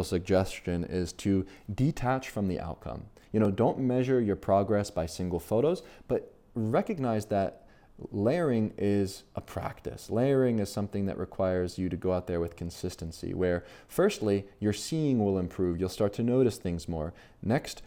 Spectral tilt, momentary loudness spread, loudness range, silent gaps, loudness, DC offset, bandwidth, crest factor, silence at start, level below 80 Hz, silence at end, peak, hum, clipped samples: -7 dB/octave; 11 LU; 3 LU; none; -30 LUFS; under 0.1%; 17 kHz; 16 dB; 0 s; -52 dBFS; 0 s; -14 dBFS; none; under 0.1%